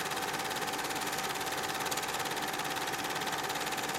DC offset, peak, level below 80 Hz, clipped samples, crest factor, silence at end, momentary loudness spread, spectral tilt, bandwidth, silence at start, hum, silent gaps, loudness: under 0.1%; -18 dBFS; -66 dBFS; under 0.1%; 18 dB; 0 s; 1 LU; -1.5 dB/octave; 16.5 kHz; 0 s; 50 Hz at -55 dBFS; none; -34 LUFS